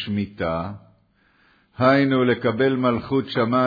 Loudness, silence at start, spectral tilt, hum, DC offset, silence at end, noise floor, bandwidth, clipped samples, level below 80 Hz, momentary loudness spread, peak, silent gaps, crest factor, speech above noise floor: -21 LUFS; 0 s; -9 dB/octave; none; under 0.1%; 0 s; -61 dBFS; 5 kHz; under 0.1%; -52 dBFS; 9 LU; -6 dBFS; none; 16 dB; 40 dB